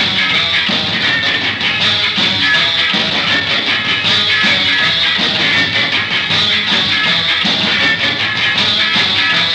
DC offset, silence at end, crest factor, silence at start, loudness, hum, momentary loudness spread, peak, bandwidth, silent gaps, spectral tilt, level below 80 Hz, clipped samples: under 0.1%; 0 s; 10 dB; 0 s; -11 LUFS; none; 2 LU; -2 dBFS; 12.5 kHz; none; -2.5 dB/octave; -48 dBFS; under 0.1%